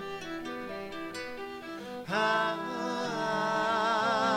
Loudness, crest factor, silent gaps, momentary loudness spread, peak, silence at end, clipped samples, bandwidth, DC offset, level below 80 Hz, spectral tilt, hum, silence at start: -32 LUFS; 18 dB; none; 13 LU; -14 dBFS; 0 s; under 0.1%; 16.5 kHz; under 0.1%; -66 dBFS; -4 dB/octave; none; 0 s